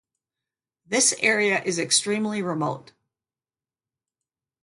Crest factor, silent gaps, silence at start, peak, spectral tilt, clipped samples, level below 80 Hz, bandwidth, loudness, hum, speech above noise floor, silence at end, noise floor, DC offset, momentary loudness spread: 22 dB; none; 0.9 s; -6 dBFS; -2 dB/octave; under 0.1%; -72 dBFS; 12 kHz; -22 LUFS; none; over 67 dB; 1.85 s; under -90 dBFS; under 0.1%; 9 LU